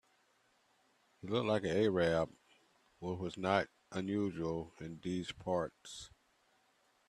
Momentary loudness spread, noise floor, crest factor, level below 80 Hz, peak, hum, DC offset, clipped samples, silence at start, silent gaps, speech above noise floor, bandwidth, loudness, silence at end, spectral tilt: 16 LU; -74 dBFS; 22 dB; -68 dBFS; -16 dBFS; none; under 0.1%; under 0.1%; 1.25 s; none; 37 dB; 12.5 kHz; -37 LUFS; 1 s; -6 dB/octave